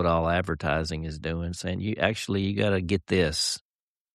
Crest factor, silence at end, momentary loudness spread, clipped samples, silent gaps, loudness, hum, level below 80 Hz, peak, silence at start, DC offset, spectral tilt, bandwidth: 20 dB; 0.55 s; 8 LU; under 0.1%; none; -27 LUFS; none; -44 dBFS; -8 dBFS; 0 s; under 0.1%; -5 dB/octave; 13.5 kHz